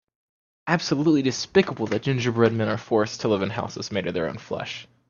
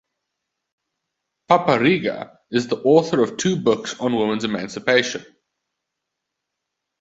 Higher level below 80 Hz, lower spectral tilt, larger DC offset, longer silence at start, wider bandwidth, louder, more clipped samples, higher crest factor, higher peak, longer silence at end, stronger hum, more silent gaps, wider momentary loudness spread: about the same, -60 dBFS vs -62 dBFS; about the same, -5.5 dB/octave vs -5 dB/octave; neither; second, 0.65 s vs 1.5 s; about the same, 7.4 kHz vs 8 kHz; second, -24 LUFS vs -20 LUFS; neither; about the same, 20 dB vs 20 dB; about the same, -4 dBFS vs -2 dBFS; second, 0.25 s vs 1.75 s; neither; neither; about the same, 10 LU vs 9 LU